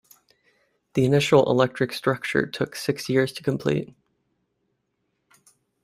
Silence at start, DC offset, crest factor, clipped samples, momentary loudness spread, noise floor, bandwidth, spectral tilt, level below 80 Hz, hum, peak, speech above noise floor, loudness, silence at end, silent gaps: 0.95 s; under 0.1%; 22 dB; under 0.1%; 10 LU; -75 dBFS; 16 kHz; -6 dB/octave; -60 dBFS; none; -4 dBFS; 53 dB; -23 LUFS; 2 s; none